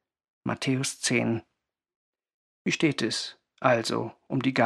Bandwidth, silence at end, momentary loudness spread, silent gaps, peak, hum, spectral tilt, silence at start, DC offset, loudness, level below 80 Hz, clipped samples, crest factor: 13.5 kHz; 0 s; 9 LU; 1.96-2.13 s, 2.34-2.65 s; -6 dBFS; none; -4.5 dB/octave; 0.45 s; under 0.1%; -28 LUFS; -72 dBFS; under 0.1%; 22 dB